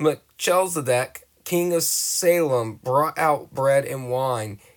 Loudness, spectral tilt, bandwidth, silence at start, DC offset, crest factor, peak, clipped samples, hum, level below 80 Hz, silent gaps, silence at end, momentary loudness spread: -22 LUFS; -4 dB/octave; over 20 kHz; 0 s; under 0.1%; 16 dB; -6 dBFS; under 0.1%; none; -64 dBFS; none; 0.2 s; 7 LU